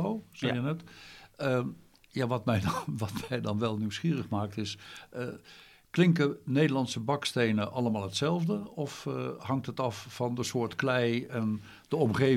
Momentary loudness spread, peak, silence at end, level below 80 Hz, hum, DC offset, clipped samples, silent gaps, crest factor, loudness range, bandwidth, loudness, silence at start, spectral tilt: 12 LU; -12 dBFS; 0 s; -64 dBFS; none; under 0.1%; under 0.1%; none; 18 dB; 4 LU; 15.5 kHz; -31 LUFS; 0 s; -6 dB/octave